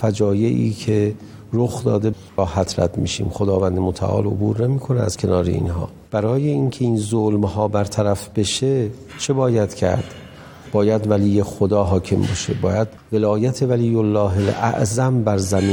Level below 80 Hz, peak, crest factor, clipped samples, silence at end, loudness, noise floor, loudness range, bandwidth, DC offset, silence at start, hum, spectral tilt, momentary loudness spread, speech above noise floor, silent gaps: -42 dBFS; -4 dBFS; 16 dB; under 0.1%; 0 s; -20 LUFS; -39 dBFS; 2 LU; 17.5 kHz; under 0.1%; 0 s; none; -6.5 dB/octave; 5 LU; 20 dB; none